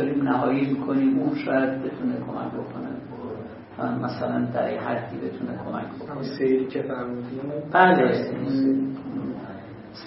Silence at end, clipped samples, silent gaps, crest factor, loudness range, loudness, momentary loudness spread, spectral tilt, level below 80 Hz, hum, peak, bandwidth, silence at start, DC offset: 0 s; under 0.1%; none; 20 dB; 6 LU; -25 LUFS; 13 LU; -11 dB/octave; -62 dBFS; none; -4 dBFS; 5.8 kHz; 0 s; under 0.1%